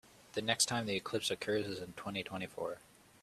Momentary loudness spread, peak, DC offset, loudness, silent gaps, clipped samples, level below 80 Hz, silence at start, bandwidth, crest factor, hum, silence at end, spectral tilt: 12 LU; -16 dBFS; under 0.1%; -37 LUFS; none; under 0.1%; -72 dBFS; 0.05 s; 14.5 kHz; 24 dB; none; 0.45 s; -2.5 dB/octave